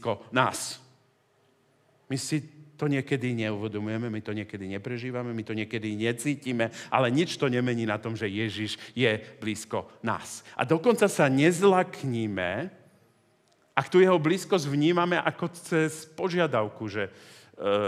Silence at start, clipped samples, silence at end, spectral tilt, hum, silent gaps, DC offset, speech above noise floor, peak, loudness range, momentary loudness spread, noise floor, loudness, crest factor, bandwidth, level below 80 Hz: 0 s; under 0.1%; 0 s; -5.5 dB/octave; none; none; under 0.1%; 39 dB; -4 dBFS; 6 LU; 12 LU; -66 dBFS; -28 LUFS; 24 dB; 15 kHz; -78 dBFS